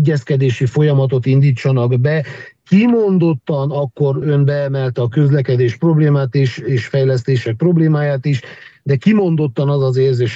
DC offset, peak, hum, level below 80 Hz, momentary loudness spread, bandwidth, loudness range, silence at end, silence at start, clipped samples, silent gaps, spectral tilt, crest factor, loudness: under 0.1%; -2 dBFS; none; -58 dBFS; 6 LU; 7.6 kHz; 1 LU; 0 s; 0 s; under 0.1%; none; -8.5 dB/octave; 12 dB; -15 LUFS